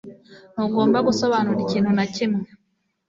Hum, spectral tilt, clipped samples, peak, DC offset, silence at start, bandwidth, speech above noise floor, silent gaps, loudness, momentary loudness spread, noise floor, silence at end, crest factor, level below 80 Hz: none; -6 dB/octave; under 0.1%; -6 dBFS; under 0.1%; 0.05 s; 7.6 kHz; 50 dB; none; -21 LUFS; 9 LU; -70 dBFS; 0.65 s; 16 dB; -60 dBFS